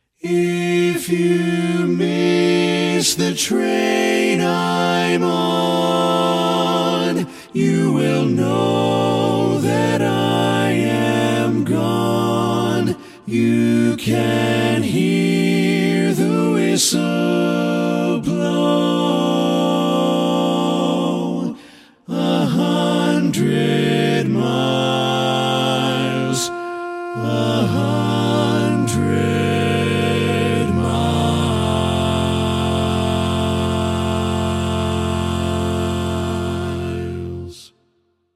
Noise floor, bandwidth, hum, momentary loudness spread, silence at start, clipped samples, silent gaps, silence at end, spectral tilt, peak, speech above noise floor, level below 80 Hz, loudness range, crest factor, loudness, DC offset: -64 dBFS; 15.5 kHz; none; 5 LU; 0.25 s; under 0.1%; none; 0.7 s; -5.5 dB/octave; -4 dBFS; 47 dB; -42 dBFS; 2 LU; 14 dB; -18 LUFS; under 0.1%